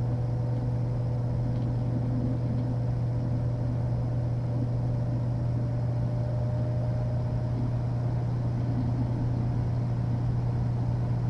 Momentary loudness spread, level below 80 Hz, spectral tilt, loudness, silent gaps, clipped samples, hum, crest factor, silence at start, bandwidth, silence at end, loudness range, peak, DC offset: 1 LU; -42 dBFS; -10 dB/octave; -29 LUFS; none; under 0.1%; none; 10 dB; 0 s; 5.8 kHz; 0 s; 0 LU; -18 dBFS; under 0.1%